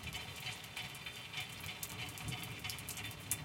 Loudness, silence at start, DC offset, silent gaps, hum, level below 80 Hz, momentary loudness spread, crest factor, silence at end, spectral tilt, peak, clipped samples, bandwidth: -44 LUFS; 0 s; under 0.1%; none; none; -62 dBFS; 2 LU; 30 dB; 0 s; -2 dB/octave; -14 dBFS; under 0.1%; 17 kHz